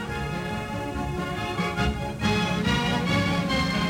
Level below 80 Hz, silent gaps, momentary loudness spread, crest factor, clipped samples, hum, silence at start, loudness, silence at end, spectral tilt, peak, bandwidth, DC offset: -38 dBFS; none; 7 LU; 14 dB; under 0.1%; none; 0 s; -26 LUFS; 0 s; -5.5 dB/octave; -10 dBFS; 16.5 kHz; under 0.1%